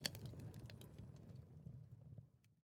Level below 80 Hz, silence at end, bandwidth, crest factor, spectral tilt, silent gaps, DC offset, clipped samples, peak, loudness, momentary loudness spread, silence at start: -72 dBFS; 0.05 s; 17.5 kHz; 34 dB; -3.5 dB/octave; none; under 0.1%; under 0.1%; -22 dBFS; -56 LUFS; 6 LU; 0 s